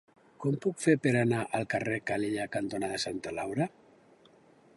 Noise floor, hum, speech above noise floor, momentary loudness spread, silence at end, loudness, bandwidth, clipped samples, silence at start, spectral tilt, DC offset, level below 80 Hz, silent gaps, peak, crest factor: -60 dBFS; none; 30 dB; 8 LU; 1.1 s; -31 LUFS; 11.5 kHz; under 0.1%; 0.4 s; -5.5 dB/octave; under 0.1%; -66 dBFS; none; -12 dBFS; 20 dB